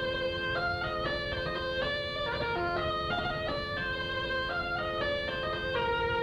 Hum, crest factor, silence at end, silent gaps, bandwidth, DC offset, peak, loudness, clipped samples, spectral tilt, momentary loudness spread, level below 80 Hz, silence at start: none; 14 dB; 0 s; none; 13.5 kHz; under 0.1%; -18 dBFS; -32 LUFS; under 0.1%; -5.5 dB/octave; 2 LU; -48 dBFS; 0 s